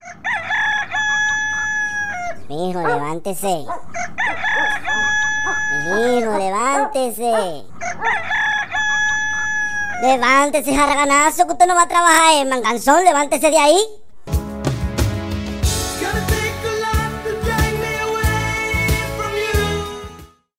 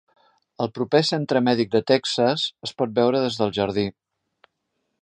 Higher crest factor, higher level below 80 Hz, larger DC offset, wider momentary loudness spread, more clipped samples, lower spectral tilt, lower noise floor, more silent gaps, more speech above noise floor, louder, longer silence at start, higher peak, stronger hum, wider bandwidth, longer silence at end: about the same, 18 dB vs 20 dB; first, -32 dBFS vs -60 dBFS; neither; first, 11 LU vs 7 LU; neither; second, -3.5 dB/octave vs -5.5 dB/octave; second, -41 dBFS vs -76 dBFS; neither; second, 26 dB vs 54 dB; first, -17 LUFS vs -22 LUFS; second, 0 s vs 0.6 s; first, 0 dBFS vs -4 dBFS; neither; first, 16 kHz vs 10.5 kHz; second, 0 s vs 1.1 s